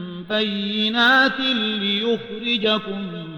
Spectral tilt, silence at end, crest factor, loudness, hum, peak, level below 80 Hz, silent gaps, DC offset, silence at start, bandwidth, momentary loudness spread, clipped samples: -5 dB/octave; 0 s; 16 dB; -20 LUFS; none; -6 dBFS; -58 dBFS; none; under 0.1%; 0 s; 16.5 kHz; 10 LU; under 0.1%